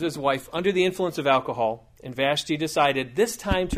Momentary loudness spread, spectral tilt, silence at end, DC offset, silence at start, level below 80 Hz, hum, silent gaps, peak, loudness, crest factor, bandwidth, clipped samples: 5 LU; -4.5 dB/octave; 0 s; under 0.1%; 0 s; -44 dBFS; none; none; -6 dBFS; -24 LUFS; 18 dB; 15.5 kHz; under 0.1%